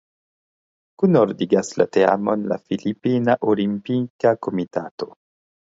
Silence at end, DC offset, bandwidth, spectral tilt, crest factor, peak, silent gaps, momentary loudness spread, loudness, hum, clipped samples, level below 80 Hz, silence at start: 0.7 s; under 0.1%; 8 kHz; -7 dB/octave; 20 dB; -2 dBFS; 4.10-4.19 s, 4.91-4.98 s; 10 LU; -20 LUFS; none; under 0.1%; -64 dBFS; 1 s